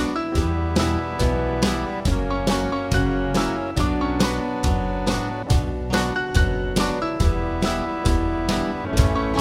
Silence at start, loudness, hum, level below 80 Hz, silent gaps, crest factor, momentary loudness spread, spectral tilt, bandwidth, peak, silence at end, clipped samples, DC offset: 0 s; -22 LUFS; none; -26 dBFS; none; 18 dB; 2 LU; -5.5 dB/octave; 16 kHz; -2 dBFS; 0 s; under 0.1%; under 0.1%